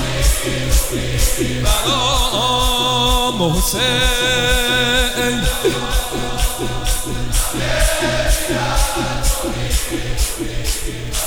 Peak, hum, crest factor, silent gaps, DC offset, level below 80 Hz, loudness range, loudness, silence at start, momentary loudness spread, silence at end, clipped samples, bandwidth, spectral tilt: -4 dBFS; none; 14 dB; none; under 0.1%; -22 dBFS; 4 LU; -17 LUFS; 0 s; 7 LU; 0 s; under 0.1%; 18 kHz; -3 dB/octave